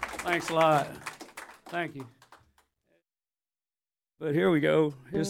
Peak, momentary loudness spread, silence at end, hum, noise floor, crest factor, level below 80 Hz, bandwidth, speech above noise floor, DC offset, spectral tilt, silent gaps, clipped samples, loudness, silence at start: -10 dBFS; 21 LU; 0 s; none; under -90 dBFS; 20 dB; -64 dBFS; 16 kHz; over 63 dB; under 0.1%; -5.5 dB/octave; none; under 0.1%; -28 LUFS; 0 s